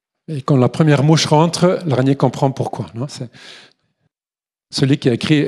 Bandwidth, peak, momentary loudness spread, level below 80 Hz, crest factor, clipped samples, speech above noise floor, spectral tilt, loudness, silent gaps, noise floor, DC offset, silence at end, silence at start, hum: 12 kHz; 0 dBFS; 14 LU; -56 dBFS; 16 dB; under 0.1%; over 75 dB; -6 dB/octave; -16 LUFS; none; under -90 dBFS; under 0.1%; 0 s; 0.3 s; none